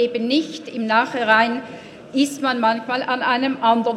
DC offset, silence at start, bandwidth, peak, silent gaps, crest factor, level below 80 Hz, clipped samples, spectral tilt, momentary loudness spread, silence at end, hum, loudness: under 0.1%; 0 s; 14 kHz; 0 dBFS; none; 20 dB; -66 dBFS; under 0.1%; -4 dB/octave; 12 LU; 0 s; none; -20 LUFS